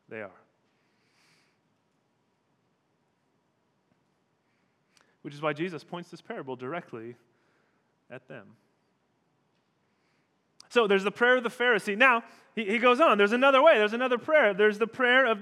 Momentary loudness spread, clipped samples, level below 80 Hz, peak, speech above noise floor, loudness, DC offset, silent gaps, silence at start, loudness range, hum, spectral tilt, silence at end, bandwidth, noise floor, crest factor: 21 LU; under 0.1%; under -90 dBFS; -6 dBFS; 48 dB; -24 LUFS; under 0.1%; none; 0.1 s; 20 LU; none; -4.5 dB/octave; 0 s; 12.5 kHz; -73 dBFS; 22 dB